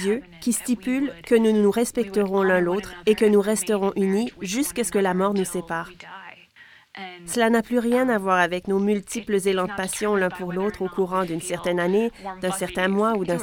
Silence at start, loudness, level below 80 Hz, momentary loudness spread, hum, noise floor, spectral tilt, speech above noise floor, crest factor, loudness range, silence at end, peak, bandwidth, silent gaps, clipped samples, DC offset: 0 s; -23 LUFS; -54 dBFS; 8 LU; none; -51 dBFS; -5 dB/octave; 29 dB; 18 dB; 4 LU; 0 s; -6 dBFS; 18 kHz; none; under 0.1%; under 0.1%